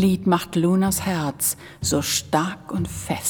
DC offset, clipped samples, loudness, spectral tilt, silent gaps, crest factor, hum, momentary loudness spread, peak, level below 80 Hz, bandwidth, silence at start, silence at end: under 0.1%; under 0.1%; -22 LUFS; -4.5 dB/octave; none; 18 dB; none; 8 LU; -4 dBFS; -46 dBFS; 19 kHz; 0 s; 0 s